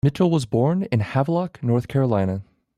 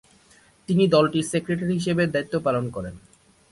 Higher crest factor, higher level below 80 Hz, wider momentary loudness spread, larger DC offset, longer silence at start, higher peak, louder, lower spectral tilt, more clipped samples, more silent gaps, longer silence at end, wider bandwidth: about the same, 14 dB vs 18 dB; about the same, -52 dBFS vs -54 dBFS; second, 4 LU vs 15 LU; neither; second, 0.05 s vs 0.7 s; about the same, -8 dBFS vs -6 dBFS; about the same, -22 LUFS vs -23 LUFS; first, -8 dB/octave vs -6 dB/octave; neither; neither; second, 0.35 s vs 0.55 s; about the same, 12 kHz vs 11.5 kHz